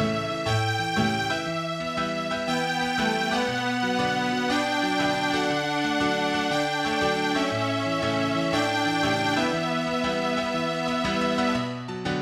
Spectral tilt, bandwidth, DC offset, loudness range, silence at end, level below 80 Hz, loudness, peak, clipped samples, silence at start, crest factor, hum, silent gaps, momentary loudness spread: -4.5 dB/octave; 16 kHz; under 0.1%; 1 LU; 0 s; -54 dBFS; -25 LUFS; -12 dBFS; under 0.1%; 0 s; 14 dB; none; none; 4 LU